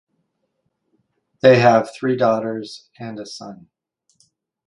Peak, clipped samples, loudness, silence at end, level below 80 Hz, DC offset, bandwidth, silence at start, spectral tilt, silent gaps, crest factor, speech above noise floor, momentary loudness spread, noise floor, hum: 0 dBFS; under 0.1%; -16 LUFS; 1.1 s; -64 dBFS; under 0.1%; 11 kHz; 1.45 s; -6.5 dB/octave; none; 20 dB; 54 dB; 22 LU; -72 dBFS; none